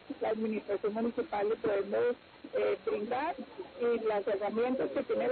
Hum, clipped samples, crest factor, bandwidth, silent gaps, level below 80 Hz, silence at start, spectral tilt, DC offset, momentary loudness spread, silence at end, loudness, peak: none; under 0.1%; 10 dB; 4.5 kHz; none; -68 dBFS; 0.05 s; -4 dB/octave; under 0.1%; 4 LU; 0 s; -33 LUFS; -22 dBFS